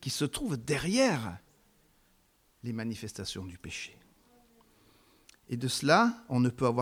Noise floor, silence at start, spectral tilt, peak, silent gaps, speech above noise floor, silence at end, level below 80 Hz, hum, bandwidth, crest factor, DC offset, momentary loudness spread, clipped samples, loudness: -68 dBFS; 0 s; -5 dB/octave; -8 dBFS; none; 38 dB; 0 s; -60 dBFS; none; 16.5 kHz; 24 dB; under 0.1%; 16 LU; under 0.1%; -31 LUFS